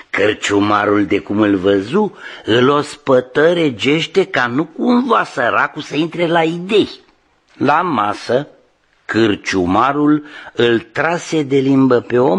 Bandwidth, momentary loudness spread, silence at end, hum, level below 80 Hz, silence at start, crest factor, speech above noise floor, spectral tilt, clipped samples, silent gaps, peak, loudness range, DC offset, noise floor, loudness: 10.5 kHz; 6 LU; 0 s; none; -54 dBFS; 0.15 s; 14 dB; 41 dB; -5.5 dB/octave; under 0.1%; none; 0 dBFS; 3 LU; under 0.1%; -55 dBFS; -15 LUFS